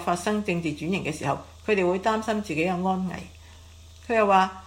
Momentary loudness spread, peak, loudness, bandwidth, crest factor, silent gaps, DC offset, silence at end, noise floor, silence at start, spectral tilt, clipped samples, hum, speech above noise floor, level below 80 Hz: 11 LU; -6 dBFS; -25 LUFS; 16 kHz; 20 dB; none; under 0.1%; 0 s; -47 dBFS; 0 s; -5.5 dB/octave; under 0.1%; none; 22 dB; -52 dBFS